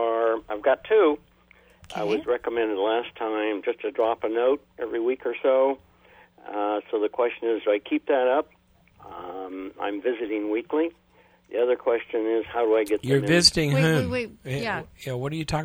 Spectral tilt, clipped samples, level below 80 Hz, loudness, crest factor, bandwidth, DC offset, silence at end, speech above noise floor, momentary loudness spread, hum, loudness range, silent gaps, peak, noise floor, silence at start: -5 dB/octave; under 0.1%; -54 dBFS; -25 LUFS; 22 dB; over 20 kHz; under 0.1%; 0 s; 32 dB; 11 LU; none; 5 LU; none; -4 dBFS; -57 dBFS; 0 s